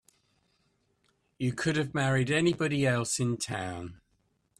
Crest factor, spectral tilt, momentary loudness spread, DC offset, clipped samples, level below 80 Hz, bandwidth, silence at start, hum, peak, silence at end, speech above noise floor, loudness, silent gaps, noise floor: 18 dB; -5 dB/octave; 10 LU; under 0.1%; under 0.1%; -62 dBFS; 13.5 kHz; 1.4 s; none; -14 dBFS; 0.65 s; 44 dB; -29 LUFS; none; -73 dBFS